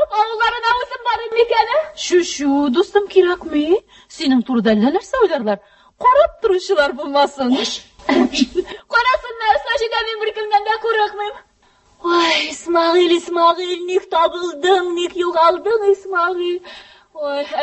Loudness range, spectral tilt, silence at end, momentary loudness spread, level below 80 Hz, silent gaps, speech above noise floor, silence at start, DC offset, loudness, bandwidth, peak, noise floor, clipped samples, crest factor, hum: 2 LU; -3.5 dB/octave; 0 s; 8 LU; -50 dBFS; none; 38 dB; 0 s; under 0.1%; -17 LUFS; 8.6 kHz; 0 dBFS; -55 dBFS; under 0.1%; 16 dB; none